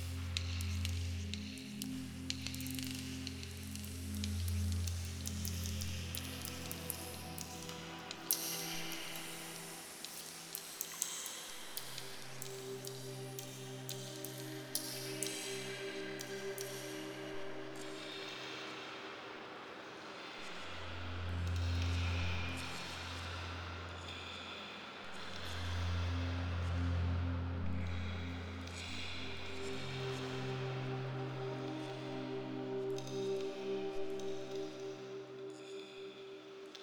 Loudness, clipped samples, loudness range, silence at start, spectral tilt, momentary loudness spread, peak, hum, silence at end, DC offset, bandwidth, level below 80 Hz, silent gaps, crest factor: -42 LUFS; under 0.1%; 5 LU; 0 s; -4 dB/octave; 8 LU; -10 dBFS; none; 0 s; under 0.1%; over 20 kHz; -54 dBFS; none; 32 dB